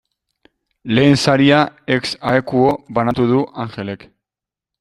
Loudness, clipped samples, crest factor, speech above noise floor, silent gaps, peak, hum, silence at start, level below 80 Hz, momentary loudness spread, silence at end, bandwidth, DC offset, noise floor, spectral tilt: -16 LUFS; under 0.1%; 16 dB; 72 dB; none; 0 dBFS; none; 0.85 s; -50 dBFS; 15 LU; 0.85 s; 12 kHz; under 0.1%; -87 dBFS; -6 dB/octave